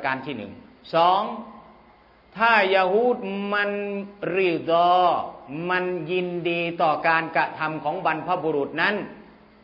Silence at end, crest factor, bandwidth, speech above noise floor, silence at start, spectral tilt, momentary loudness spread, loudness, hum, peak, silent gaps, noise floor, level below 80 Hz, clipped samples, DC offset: 0.4 s; 20 dB; 5.8 kHz; 31 dB; 0 s; -7.5 dB/octave; 14 LU; -23 LUFS; none; -4 dBFS; none; -54 dBFS; -64 dBFS; under 0.1%; under 0.1%